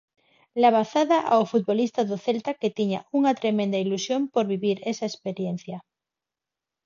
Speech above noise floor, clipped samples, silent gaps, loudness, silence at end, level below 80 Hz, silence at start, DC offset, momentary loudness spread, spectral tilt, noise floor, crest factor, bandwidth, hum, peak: 65 dB; under 0.1%; none; -24 LUFS; 1.05 s; -74 dBFS; 0.55 s; under 0.1%; 10 LU; -5.5 dB/octave; -89 dBFS; 18 dB; 7.4 kHz; none; -6 dBFS